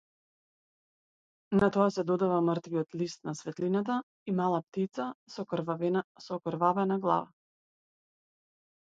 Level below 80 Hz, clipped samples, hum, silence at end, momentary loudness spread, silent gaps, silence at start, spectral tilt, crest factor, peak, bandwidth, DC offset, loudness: -68 dBFS; under 0.1%; none; 1.55 s; 11 LU; 4.03-4.26 s, 4.63-4.72 s, 5.15-5.26 s, 6.04-6.15 s; 1.5 s; -7 dB/octave; 20 dB; -12 dBFS; 7.8 kHz; under 0.1%; -31 LUFS